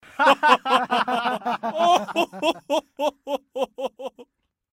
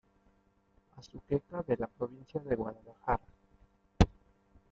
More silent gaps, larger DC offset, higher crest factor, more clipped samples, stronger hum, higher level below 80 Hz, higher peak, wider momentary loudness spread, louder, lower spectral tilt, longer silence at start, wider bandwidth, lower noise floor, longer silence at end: neither; neither; second, 20 dB vs 28 dB; neither; neither; second, -70 dBFS vs -44 dBFS; first, -2 dBFS vs -8 dBFS; about the same, 14 LU vs 14 LU; first, -22 LUFS vs -35 LUFS; second, -3 dB/octave vs -7 dB/octave; second, 0.2 s vs 0.95 s; first, 16 kHz vs 7.8 kHz; second, -54 dBFS vs -70 dBFS; second, 0.5 s vs 0.65 s